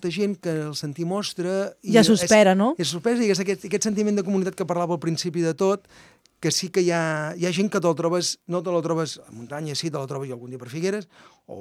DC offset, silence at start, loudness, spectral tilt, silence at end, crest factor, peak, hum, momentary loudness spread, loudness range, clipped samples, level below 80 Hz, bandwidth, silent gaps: under 0.1%; 0 s; -23 LUFS; -4.5 dB/octave; 0 s; 20 dB; -4 dBFS; none; 13 LU; 6 LU; under 0.1%; -66 dBFS; 15 kHz; none